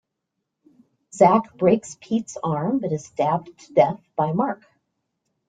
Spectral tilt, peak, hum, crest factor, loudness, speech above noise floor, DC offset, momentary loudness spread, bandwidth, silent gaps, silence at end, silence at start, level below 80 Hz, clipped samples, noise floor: -7 dB/octave; -2 dBFS; none; 20 dB; -22 LUFS; 59 dB; under 0.1%; 10 LU; 9.4 kHz; none; 0.95 s; 1.15 s; -64 dBFS; under 0.1%; -80 dBFS